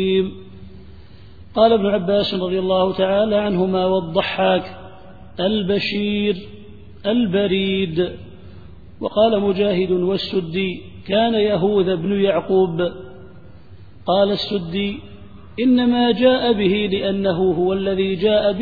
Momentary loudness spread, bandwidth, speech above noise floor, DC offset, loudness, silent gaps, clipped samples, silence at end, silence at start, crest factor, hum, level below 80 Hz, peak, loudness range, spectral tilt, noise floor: 12 LU; 4.9 kHz; 25 dB; 0.7%; -19 LUFS; none; under 0.1%; 0 s; 0 s; 18 dB; none; -48 dBFS; -2 dBFS; 3 LU; -8.5 dB/octave; -43 dBFS